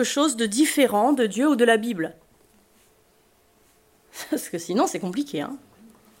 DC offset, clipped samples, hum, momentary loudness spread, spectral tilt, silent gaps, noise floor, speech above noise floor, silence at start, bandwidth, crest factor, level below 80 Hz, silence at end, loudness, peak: under 0.1%; under 0.1%; none; 14 LU; -3.5 dB/octave; none; -61 dBFS; 38 dB; 0 s; 16.5 kHz; 20 dB; -70 dBFS; 0.65 s; -22 LUFS; -6 dBFS